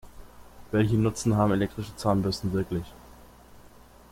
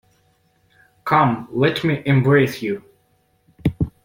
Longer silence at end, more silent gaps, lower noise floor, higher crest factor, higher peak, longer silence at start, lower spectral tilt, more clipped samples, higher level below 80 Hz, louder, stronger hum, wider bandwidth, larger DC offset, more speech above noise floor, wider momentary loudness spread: first, 1.05 s vs 0.15 s; neither; second, -52 dBFS vs -62 dBFS; about the same, 18 dB vs 18 dB; second, -10 dBFS vs -2 dBFS; second, 0.05 s vs 1.05 s; about the same, -6.5 dB/octave vs -7.5 dB/octave; neither; about the same, -48 dBFS vs -44 dBFS; second, -27 LUFS vs -19 LUFS; first, 60 Hz at -45 dBFS vs none; about the same, 16 kHz vs 16.5 kHz; neither; second, 26 dB vs 45 dB; about the same, 9 LU vs 11 LU